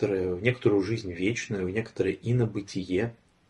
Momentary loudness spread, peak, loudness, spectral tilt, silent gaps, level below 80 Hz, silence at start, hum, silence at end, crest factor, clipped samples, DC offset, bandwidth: 6 LU; -8 dBFS; -28 LUFS; -6.5 dB/octave; none; -58 dBFS; 0 s; none; 0.35 s; 20 dB; under 0.1%; under 0.1%; 10.5 kHz